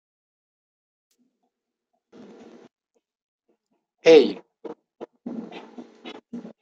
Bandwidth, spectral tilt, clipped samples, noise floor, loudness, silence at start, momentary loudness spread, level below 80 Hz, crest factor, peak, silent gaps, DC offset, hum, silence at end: 7.2 kHz; -4.5 dB/octave; under 0.1%; -79 dBFS; -17 LUFS; 4.05 s; 27 LU; -76 dBFS; 24 dB; -2 dBFS; none; under 0.1%; none; 0.2 s